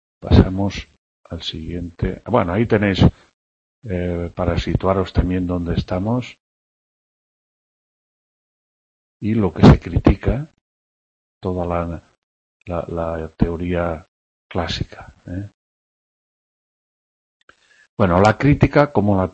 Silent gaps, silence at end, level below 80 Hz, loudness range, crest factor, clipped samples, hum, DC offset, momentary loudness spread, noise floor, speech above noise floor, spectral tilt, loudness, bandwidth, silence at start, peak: 0.98-1.24 s, 3.33-3.82 s, 6.40-9.20 s, 10.61-11.41 s, 12.18-12.60 s, 14.08-14.50 s, 15.54-17.48 s, 17.89-17.97 s; 0.05 s; -32 dBFS; 11 LU; 20 dB; under 0.1%; none; under 0.1%; 17 LU; under -90 dBFS; over 72 dB; -8 dB/octave; -19 LUFS; 8.4 kHz; 0.2 s; 0 dBFS